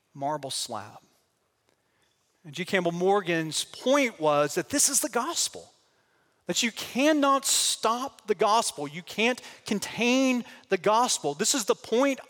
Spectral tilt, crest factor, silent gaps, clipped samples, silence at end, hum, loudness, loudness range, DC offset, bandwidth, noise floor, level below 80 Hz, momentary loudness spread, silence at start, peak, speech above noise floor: -2.5 dB/octave; 18 dB; none; under 0.1%; 0.05 s; none; -26 LUFS; 5 LU; under 0.1%; 17 kHz; -72 dBFS; -72 dBFS; 10 LU; 0.15 s; -8 dBFS; 46 dB